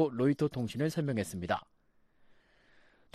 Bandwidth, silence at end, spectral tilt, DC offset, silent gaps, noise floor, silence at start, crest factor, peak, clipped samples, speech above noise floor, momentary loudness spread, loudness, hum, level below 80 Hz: 14 kHz; 1.5 s; -6.5 dB/octave; under 0.1%; none; -67 dBFS; 0 s; 18 dB; -16 dBFS; under 0.1%; 35 dB; 6 LU; -33 LUFS; none; -64 dBFS